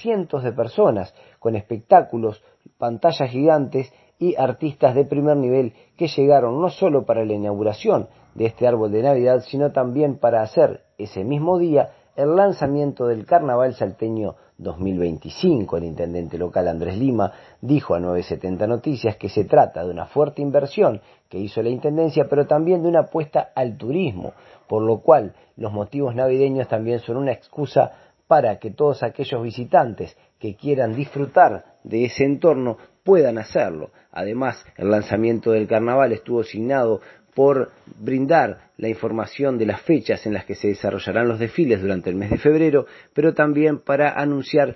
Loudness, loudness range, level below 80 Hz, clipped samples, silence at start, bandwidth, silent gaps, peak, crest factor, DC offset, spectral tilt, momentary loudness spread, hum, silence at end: -20 LUFS; 3 LU; -54 dBFS; under 0.1%; 0 s; 6 kHz; none; 0 dBFS; 20 dB; under 0.1%; -8.5 dB/octave; 11 LU; none; 0 s